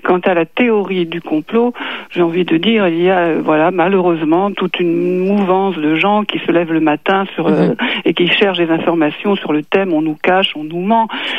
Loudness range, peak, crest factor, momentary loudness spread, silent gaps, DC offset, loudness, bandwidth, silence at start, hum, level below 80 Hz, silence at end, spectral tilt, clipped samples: 1 LU; 0 dBFS; 14 dB; 4 LU; none; 0.6%; -14 LUFS; 5.6 kHz; 0.05 s; none; -62 dBFS; 0 s; -7.5 dB/octave; under 0.1%